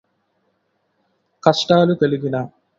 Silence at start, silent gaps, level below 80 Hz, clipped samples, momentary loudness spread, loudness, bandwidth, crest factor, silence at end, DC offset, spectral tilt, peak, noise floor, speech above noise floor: 1.45 s; none; -60 dBFS; under 0.1%; 9 LU; -17 LUFS; 7.8 kHz; 20 dB; 0.3 s; under 0.1%; -6 dB/octave; 0 dBFS; -68 dBFS; 52 dB